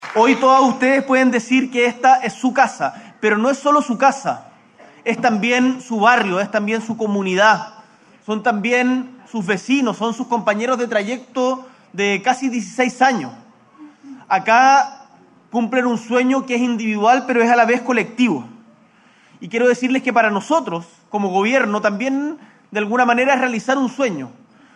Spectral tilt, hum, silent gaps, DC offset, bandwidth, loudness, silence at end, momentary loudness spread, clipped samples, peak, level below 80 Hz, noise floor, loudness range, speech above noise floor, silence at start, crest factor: -4.5 dB/octave; none; none; under 0.1%; 10.5 kHz; -17 LUFS; 0.45 s; 12 LU; under 0.1%; 0 dBFS; -72 dBFS; -52 dBFS; 3 LU; 35 dB; 0 s; 18 dB